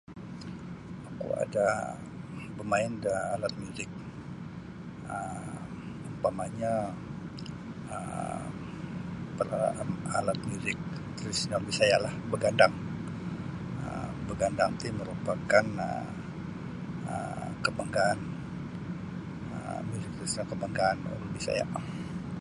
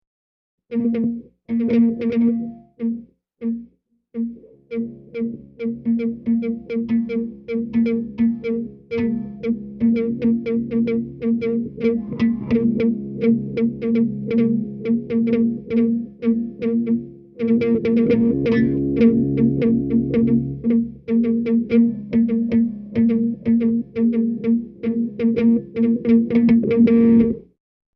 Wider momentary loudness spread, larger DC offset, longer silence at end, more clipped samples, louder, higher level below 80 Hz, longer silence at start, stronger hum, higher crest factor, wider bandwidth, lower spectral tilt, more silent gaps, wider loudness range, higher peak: first, 15 LU vs 11 LU; neither; second, 0 s vs 0.55 s; neither; second, -33 LUFS vs -20 LUFS; second, -54 dBFS vs -48 dBFS; second, 0.1 s vs 0.7 s; neither; first, 26 dB vs 14 dB; first, 11.5 kHz vs 5.2 kHz; second, -5 dB/octave vs -10.5 dB/octave; neither; about the same, 7 LU vs 7 LU; about the same, -6 dBFS vs -4 dBFS